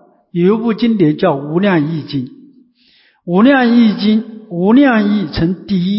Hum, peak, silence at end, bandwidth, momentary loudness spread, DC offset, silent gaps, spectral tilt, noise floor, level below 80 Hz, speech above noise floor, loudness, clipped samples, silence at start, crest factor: none; 0 dBFS; 0 s; 5.8 kHz; 13 LU; under 0.1%; none; -11.5 dB/octave; -52 dBFS; -42 dBFS; 40 dB; -13 LUFS; under 0.1%; 0.35 s; 12 dB